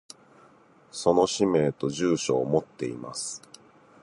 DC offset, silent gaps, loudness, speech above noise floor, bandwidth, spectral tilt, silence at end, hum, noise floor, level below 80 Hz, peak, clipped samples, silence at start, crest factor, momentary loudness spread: under 0.1%; none; -26 LUFS; 31 dB; 11.5 kHz; -5 dB/octave; 0.65 s; none; -57 dBFS; -62 dBFS; -8 dBFS; under 0.1%; 0.95 s; 20 dB; 12 LU